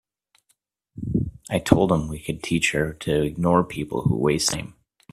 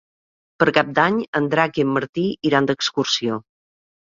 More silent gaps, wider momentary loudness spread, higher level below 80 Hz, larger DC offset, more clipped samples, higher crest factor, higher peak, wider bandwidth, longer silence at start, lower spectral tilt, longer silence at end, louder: second, none vs 1.28-1.33 s, 2.09-2.13 s; first, 11 LU vs 5 LU; first, -44 dBFS vs -60 dBFS; neither; neither; about the same, 24 dB vs 20 dB; about the same, 0 dBFS vs -2 dBFS; first, 15 kHz vs 7.6 kHz; first, 0.95 s vs 0.6 s; about the same, -5 dB/octave vs -4.5 dB/octave; second, 0.4 s vs 0.7 s; second, -23 LUFS vs -20 LUFS